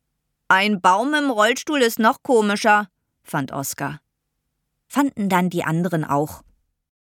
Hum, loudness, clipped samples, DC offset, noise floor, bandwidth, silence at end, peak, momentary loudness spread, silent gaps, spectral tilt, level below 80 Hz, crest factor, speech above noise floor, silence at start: none; -20 LUFS; under 0.1%; under 0.1%; -76 dBFS; 18.5 kHz; 0.65 s; -2 dBFS; 11 LU; none; -4.5 dB/octave; -62 dBFS; 18 dB; 57 dB; 0.5 s